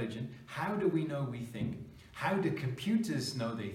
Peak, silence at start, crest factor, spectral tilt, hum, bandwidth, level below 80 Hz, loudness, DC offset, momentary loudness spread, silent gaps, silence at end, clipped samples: -20 dBFS; 0 s; 16 dB; -6 dB/octave; none; 16 kHz; -64 dBFS; -35 LUFS; under 0.1%; 9 LU; none; 0 s; under 0.1%